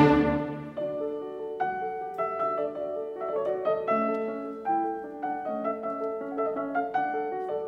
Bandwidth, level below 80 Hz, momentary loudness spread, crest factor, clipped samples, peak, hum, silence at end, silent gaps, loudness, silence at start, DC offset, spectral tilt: 6.6 kHz; -54 dBFS; 7 LU; 22 dB; under 0.1%; -8 dBFS; none; 0 s; none; -30 LUFS; 0 s; under 0.1%; -8.5 dB/octave